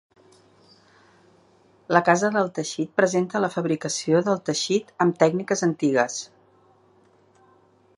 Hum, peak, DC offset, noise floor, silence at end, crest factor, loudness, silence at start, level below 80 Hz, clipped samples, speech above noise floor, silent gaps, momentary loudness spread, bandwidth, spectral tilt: none; -2 dBFS; under 0.1%; -58 dBFS; 1.75 s; 24 dB; -23 LUFS; 1.9 s; -72 dBFS; under 0.1%; 36 dB; none; 6 LU; 11 kHz; -4.5 dB/octave